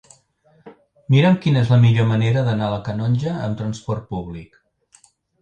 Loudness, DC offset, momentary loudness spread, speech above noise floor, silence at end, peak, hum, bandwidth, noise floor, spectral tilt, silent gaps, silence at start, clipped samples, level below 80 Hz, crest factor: -19 LUFS; under 0.1%; 14 LU; 40 dB; 0.95 s; -4 dBFS; none; 8.6 kHz; -58 dBFS; -8 dB/octave; none; 0.65 s; under 0.1%; -50 dBFS; 16 dB